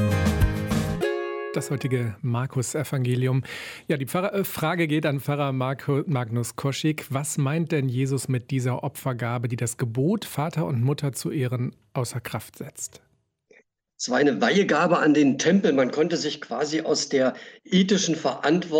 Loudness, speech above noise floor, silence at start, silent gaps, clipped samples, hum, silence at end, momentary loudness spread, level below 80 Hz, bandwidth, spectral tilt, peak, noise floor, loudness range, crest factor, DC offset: -25 LUFS; 37 dB; 0 s; none; under 0.1%; none; 0 s; 10 LU; -44 dBFS; 17.5 kHz; -5.5 dB/octave; -10 dBFS; -61 dBFS; 6 LU; 14 dB; under 0.1%